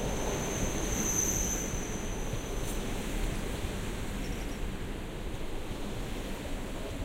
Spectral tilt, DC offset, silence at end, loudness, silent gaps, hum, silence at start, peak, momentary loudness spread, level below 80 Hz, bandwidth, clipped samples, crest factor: -3.5 dB/octave; under 0.1%; 0 s; -35 LUFS; none; none; 0 s; -16 dBFS; 11 LU; -38 dBFS; 16 kHz; under 0.1%; 16 dB